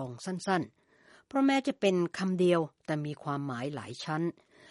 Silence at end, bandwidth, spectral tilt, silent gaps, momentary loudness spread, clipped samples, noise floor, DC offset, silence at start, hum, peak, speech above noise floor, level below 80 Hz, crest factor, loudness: 0.4 s; 11.5 kHz; -6 dB/octave; none; 10 LU; under 0.1%; -62 dBFS; under 0.1%; 0 s; none; -14 dBFS; 31 dB; -76 dBFS; 18 dB; -31 LUFS